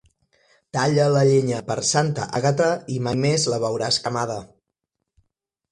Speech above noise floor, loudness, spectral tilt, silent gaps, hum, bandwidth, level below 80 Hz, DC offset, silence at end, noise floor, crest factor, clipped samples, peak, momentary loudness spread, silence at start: 60 dB; -21 LUFS; -4.5 dB/octave; none; none; 11.5 kHz; -58 dBFS; under 0.1%; 1.25 s; -80 dBFS; 16 dB; under 0.1%; -6 dBFS; 8 LU; 0.75 s